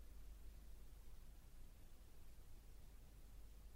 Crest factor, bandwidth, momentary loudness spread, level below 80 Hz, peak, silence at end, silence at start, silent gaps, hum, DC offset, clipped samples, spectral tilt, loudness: 10 dB; 16 kHz; 3 LU; -60 dBFS; -46 dBFS; 0 s; 0 s; none; none; under 0.1%; under 0.1%; -5 dB/octave; -65 LUFS